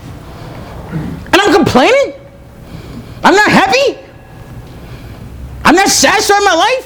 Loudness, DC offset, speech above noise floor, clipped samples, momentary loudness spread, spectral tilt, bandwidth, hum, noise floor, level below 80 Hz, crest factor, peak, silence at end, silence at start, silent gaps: -9 LUFS; under 0.1%; 24 dB; 0.4%; 23 LU; -3 dB/octave; over 20 kHz; none; -34 dBFS; -34 dBFS; 12 dB; 0 dBFS; 0 s; 0 s; none